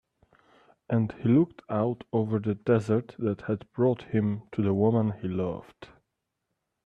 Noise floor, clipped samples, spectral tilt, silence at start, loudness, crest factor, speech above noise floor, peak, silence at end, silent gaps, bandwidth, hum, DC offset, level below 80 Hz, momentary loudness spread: -82 dBFS; under 0.1%; -10 dB/octave; 0.9 s; -28 LUFS; 16 dB; 55 dB; -12 dBFS; 1 s; none; 8.4 kHz; none; under 0.1%; -64 dBFS; 8 LU